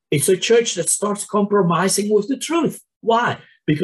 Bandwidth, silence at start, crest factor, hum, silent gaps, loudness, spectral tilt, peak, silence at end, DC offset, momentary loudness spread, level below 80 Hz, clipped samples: 13 kHz; 0.1 s; 14 dB; none; 2.96-3.00 s; -18 LUFS; -4 dB/octave; -6 dBFS; 0 s; under 0.1%; 7 LU; -60 dBFS; under 0.1%